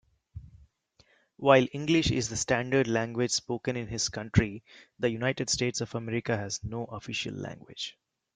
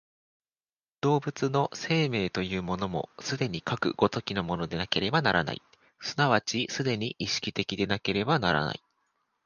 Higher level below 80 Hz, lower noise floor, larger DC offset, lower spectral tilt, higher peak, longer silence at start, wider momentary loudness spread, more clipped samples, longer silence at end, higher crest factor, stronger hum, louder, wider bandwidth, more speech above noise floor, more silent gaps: about the same, -52 dBFS vs -56 dBFS; second, -66 dBFS vs under -90 dBFS; neither; about the same, -4.5 dB/octave vs -5 dB/octave; about the same, -6 dBFS vs -8 dBFS; second, 0.35 s vs 1.05 s; first, 14 LU vs 8 LU; neither; second, 0.45 s vs 0.7 s; about the same, 24 dB vs 22 dB; neither; about the same, -29 LUFS vs -29 LUFS; about the same, 9.6 kHz vs 9.6 kHz; second, 37 dB vs over 61 dB; neither